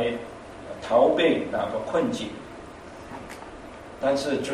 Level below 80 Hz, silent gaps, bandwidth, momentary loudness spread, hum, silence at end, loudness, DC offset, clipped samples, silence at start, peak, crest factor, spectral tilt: -54 dBFS; none; 13 kHz; 21 LU; none; 0 s; -25 LUFS; under 0.1%; under 0.1%; 0 s; -6 dBFS; 20 dB; -5 dB/octave